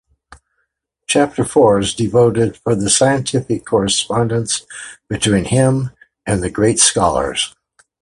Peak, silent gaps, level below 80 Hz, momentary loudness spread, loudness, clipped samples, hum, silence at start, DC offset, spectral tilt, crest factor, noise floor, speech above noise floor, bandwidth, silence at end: 0 dBFS; none; -40 dBFS; 10 LU; -15 LUFS; under 0.1%; none; 1.1 s; under 0.1%; -4 dB/octave; 16 dB; -70 dBFS; 55 dB; 11.5 kHz; 0.5 s